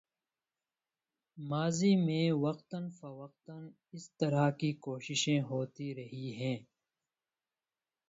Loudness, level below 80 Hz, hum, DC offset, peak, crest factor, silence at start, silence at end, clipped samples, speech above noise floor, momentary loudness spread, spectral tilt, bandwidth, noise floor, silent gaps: -34 LUFS; -76 dBFS; none; under 0.1%; -18 dBFS; 18 dB; 1.35 s; 1.45 s; under 0.1%; over 56 dB; 21 LU; -5.5 dB/octave; 8 kHz; under -90 dBFS; none